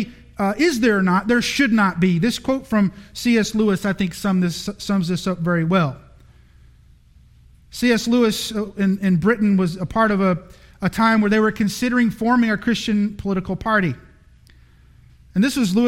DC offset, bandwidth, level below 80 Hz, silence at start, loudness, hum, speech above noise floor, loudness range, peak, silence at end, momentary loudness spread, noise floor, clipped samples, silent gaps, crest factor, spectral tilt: under 0.1%; 16 kHz; -46 dBFS; 0 s; -19 LUFS; none; 31 dB; 4 LU; -4 dBFS; 0 s; 8 LU; -50 dBFS; under 0.1%; none; 16 dB; -5.5 dB/octave